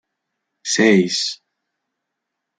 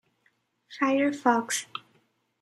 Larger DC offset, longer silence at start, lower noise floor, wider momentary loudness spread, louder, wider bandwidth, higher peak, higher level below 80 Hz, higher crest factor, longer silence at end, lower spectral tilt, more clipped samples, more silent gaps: neither; about the same, 0.65 s vs 0.7 s; first, -79 dBFS vs -71 dBFS; about the same, 17 LU vs 17 LU; first, -17 LUFS vs -26 LUFS; second, 9.6 kHz vs 14.5 kHz; first, -2 dBFS vs -8 dBFS; first, -66 dBFS vs -84 dBFS; about the same, 20 dB vs 22 dB; first, 1.25 s vs 0.65 s; about the same, -3.5 dB/octave vs -2.5 dB/octave; neither; neither